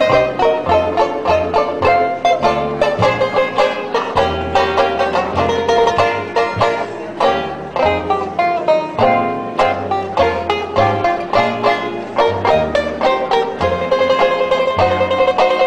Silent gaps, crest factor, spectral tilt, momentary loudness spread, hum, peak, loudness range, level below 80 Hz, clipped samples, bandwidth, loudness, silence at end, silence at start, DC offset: none; 14 dB; -5.5 dB/octave; 4 LU; none; 0 dBFS; 1 LU; -40 dBFS; under 0.1%; 9.8 kHz; -15 LUFS; 0 s; 0 s; under 0.1%